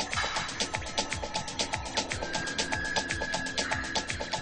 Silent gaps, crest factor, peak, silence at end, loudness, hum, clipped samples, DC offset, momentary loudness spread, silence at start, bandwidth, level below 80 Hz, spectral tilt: none; 20 dB; -12 dBFS; 0 s; -31 LUFS; none; under 0.1%; under 0.1%; 3 LU; 0 s; 10 kHz; -48 dBFS; -2 dB/octave